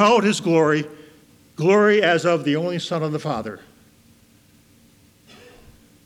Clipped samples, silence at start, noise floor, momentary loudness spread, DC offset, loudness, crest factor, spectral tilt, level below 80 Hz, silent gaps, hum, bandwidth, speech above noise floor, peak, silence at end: under 0.1%; 0 s; -54 dBFS; 18 LU; under 0.1%; -19 LUFS; 20 dB; -5.5 dB/octave; -62 dBFS; none; none; 14.5 kHz; 36 dB; -2 dBFS; 2.5 s